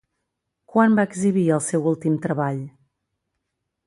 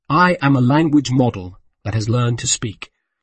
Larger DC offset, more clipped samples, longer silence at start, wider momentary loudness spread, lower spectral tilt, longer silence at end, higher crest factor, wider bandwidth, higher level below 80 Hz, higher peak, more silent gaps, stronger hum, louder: neither; neither; first, 0.75 s vs 0.1 s; second, 8 LU vs 19 LU; first, -7 dB/octave vs -5 dB/octave; first, 1.2 s vs 0.4 s; about the same, 18 dB vs 14 dB; first, 11.5 kHz vs 8.8 kHz; second, -66 dBFS vs -48 dBFS; about the same, -4 dBFS vs -2 dBFS; neither; neither; second, -21 LUFS vs -17 LUFS